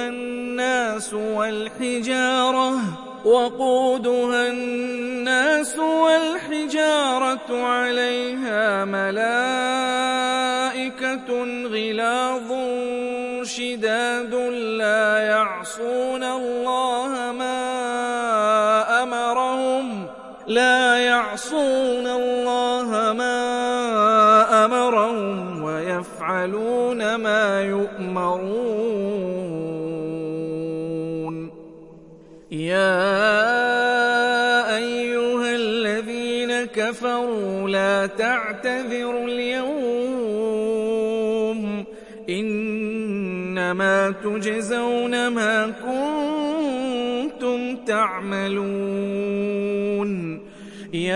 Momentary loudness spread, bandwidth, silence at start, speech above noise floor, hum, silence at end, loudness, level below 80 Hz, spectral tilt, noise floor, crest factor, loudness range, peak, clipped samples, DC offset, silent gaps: 9 LU; 11.5 kHz; 0 s; 23 dB; none; 0 s; -22 LUFS; -62 dBFS; -4 dB/octave; -45 dBFS; 18 dB; 5 LU; -4 dBFS; under 0.1%; under 0.1%; none